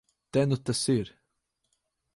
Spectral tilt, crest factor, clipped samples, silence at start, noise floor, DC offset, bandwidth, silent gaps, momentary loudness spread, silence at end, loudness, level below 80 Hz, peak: -5.5 dB/octave; 18 dB; under 0.1%; 0.35 s; -79 dBFS; under 0.1%; 11.5 kHz; none; 4 LU; 1.1 s; -28 LUFS; -62 dBFS; -14 dBFS